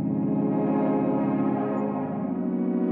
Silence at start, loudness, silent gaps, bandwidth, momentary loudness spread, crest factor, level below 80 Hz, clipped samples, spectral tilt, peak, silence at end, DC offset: 0 s; -26 LUFS; none; 3.4 kHz; 4 LU; 12 dB; -70 dBFS; under 0.1%; -12 dB/octave; -14 dBFS; 0 s; under 0.1%